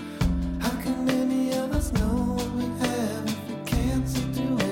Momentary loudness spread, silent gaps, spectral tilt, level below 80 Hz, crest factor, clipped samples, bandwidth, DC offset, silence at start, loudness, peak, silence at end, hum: 4 LU; none; -6 dB/octave; -34 dBFS; 12 dB; under 0.1%; 17 kHz; under 0.1%; 0 s; -27 LUFS; -14 dBFS; 0 s; none